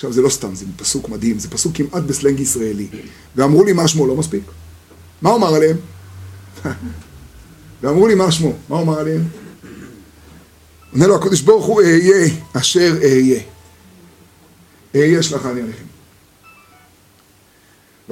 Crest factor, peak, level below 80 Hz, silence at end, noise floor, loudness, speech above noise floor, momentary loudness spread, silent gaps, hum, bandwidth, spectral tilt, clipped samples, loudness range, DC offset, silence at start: 16 dB; 0 dBFS; -46 dBFS; 0 s; -50 dBFS; -15 LUFS; 36 dB; 21 LU; none; none; 16 kHz; -5 dB/octave; under 0.1%; 8 LU; under 0.1%; 0 s